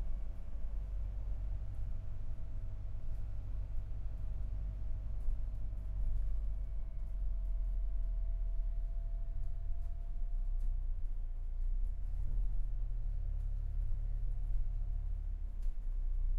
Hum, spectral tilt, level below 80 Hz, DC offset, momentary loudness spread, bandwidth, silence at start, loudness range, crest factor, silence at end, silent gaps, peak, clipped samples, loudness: none; -9 dB/octave; -36 dBFS; under 0.1%; 5 LU; 1.7 kHz; 0 s; 3 LU; 12 dB; 0 s; none; -24 dBFS; under 0.1%; -44 LUFS